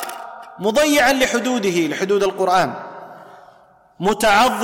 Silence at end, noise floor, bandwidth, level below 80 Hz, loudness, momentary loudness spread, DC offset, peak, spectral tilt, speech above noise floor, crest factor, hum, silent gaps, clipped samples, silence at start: 0 s; -51 dBFS; 17 kHz; -48 dBFS; -17 LUFS; 19 LU; under 0.1%; -4 dBFS; -3.5 dB/octave; 34 dB; 14 dB; none; none; under 0.1%; 0 s